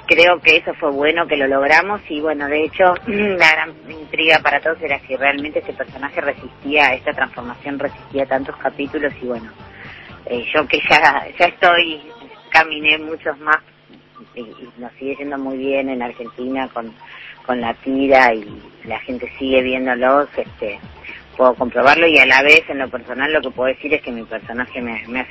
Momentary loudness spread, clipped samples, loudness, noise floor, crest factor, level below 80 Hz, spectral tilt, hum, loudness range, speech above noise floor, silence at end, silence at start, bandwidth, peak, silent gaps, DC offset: 19 LU; under 0.1%; -16 LUFS; -45 dBFS; 18 dB; -50 dBFS; -4 dB/octave; none; 10 LU; 28 dB; 0 s; 0.1 s; 8 kHz; 0 dBFS; none; under 0.1%